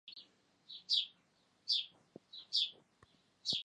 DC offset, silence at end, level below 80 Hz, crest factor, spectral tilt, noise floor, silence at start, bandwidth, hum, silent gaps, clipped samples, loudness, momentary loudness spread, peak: under 0.1%; 0.05 s; -86 dBFS; 22 dB; -0.5 dB/octave; -74 dBFS; 0.05 s; 11 kHz; none; none; under 0.1%; -36 LUFS; 19 LU; -20 dBFS